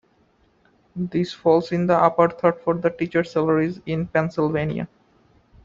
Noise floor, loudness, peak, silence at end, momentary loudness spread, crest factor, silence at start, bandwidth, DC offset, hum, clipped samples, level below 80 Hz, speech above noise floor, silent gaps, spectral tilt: -61 dBFS; -21 LUFS; -2 dBFS; 0.8 s; 9 LU; 20 dB; 0.95 s; 7.4 kHz; under 0.1%; none; under 0.1%; -56 dBFS; 40 dB; none; -8 dB/octave